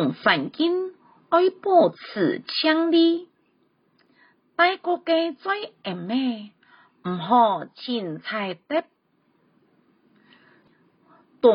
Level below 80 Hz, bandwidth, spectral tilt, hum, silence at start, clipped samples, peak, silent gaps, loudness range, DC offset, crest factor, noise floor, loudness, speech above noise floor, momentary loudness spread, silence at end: -74 dBFS; 5.4 kHz; -9.5 dB/octave; none; 0 s; under 0.1%; -4 dBFS; none; 10 LU; under 0.1%; 20 dB; -66 dBFS; -23 LUFS; 44 dB; 11 LU; 0 s